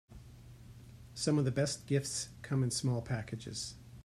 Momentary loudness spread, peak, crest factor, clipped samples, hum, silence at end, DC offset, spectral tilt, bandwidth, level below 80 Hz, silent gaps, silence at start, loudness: 23 LU; -18 dBFS; 18 dB; under 0.1%; none; 0.05 s; under 0.1%; -5 dB/octave; 13.5 kHz; -60 dBFS; none; 0.1 s; -35 LUFS